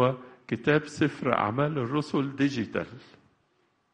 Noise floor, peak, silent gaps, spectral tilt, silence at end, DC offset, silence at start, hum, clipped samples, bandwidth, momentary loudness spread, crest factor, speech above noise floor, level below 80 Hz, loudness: -70 dBFS; -6 dBFS; none; -7 dB/octave; 0.95 s; under 0.1%; 0 s; none; under 0.1%; 10 kHz; 9 LU; 24 dB; 43 dB; -64 dBFS; -28 LUFS